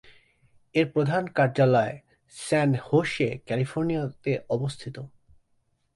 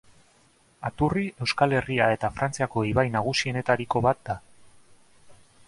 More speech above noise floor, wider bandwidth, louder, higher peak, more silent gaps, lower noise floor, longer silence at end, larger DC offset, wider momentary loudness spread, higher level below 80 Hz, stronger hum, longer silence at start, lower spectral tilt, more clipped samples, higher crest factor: first, 45 dB vs 36 dB; about the same, 11.5 kHz vs 11.5 kHz; about the same, -26 LUFS vs -25 LUFS; about the same, -8 dBFS vs -6 dBFS; neither; first, -70 dBFS vs -61 dBFS; first, 0.9 s vs 0.35 s; neither; first, 17 LU vs 9 LU; second, -62 dBFS vs -50 dBFS; neither; about the same, 0.75 s vs 0.8 s; about the same, -6.5 dB/octave vs -5.5 dB/octave; neither; about the same, 18 dB vs 22 dB